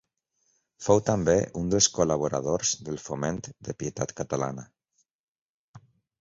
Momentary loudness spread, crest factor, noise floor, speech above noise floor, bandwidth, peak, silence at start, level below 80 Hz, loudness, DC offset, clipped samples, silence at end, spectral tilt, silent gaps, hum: 12 LU; 24 dB; -74 dBFS; 48 dB; 8 kHz; -6 dBFS; 0.8 s; -52 dBFS; -27 LUFS; under 0.1%; under 0.1%; 0.4 s; -4 dB/octave; 5.11-5.35 s, 5.41-5.74 s; none